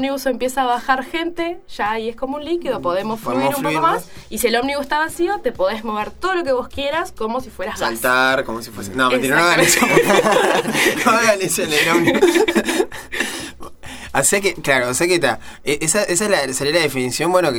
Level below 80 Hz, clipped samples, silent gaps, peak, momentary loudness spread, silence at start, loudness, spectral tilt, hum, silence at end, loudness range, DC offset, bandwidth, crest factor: -46 dBFS; under 0.1%; none; 0 dBFS; 11 LU; 0 s; -17 LUFS; -3 dB/octave; none; 0 s; 7 LU; under 0.1%; 17.5 kHz; 18 dB